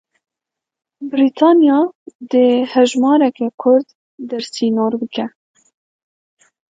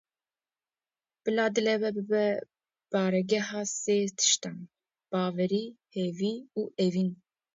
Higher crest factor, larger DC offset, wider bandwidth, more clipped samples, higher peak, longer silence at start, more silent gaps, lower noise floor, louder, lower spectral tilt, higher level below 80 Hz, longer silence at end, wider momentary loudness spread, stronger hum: about the same, 16 dB vs 18 dB; neither; first, 9.2 kHz vs 8 kHz; neither; first, 0 dBFS vs -12 dBFS; second, 1 s vs 1.25 s; first, 1.95-2.06 s, 2.15-2.19 s, 3.54-3.58 s, 3.95-4.18 s vs none; second, -84 dBFS vs under -90 dBFS; first, -15 LUFS vs -29 LUFS; about the same, -5 dB/octave vs -4 dB/octave; first, -70 dBFS vs -78 dBFS; first, 1.5 s vs 0.4 s; first, 14 LU vs 10 LU; neither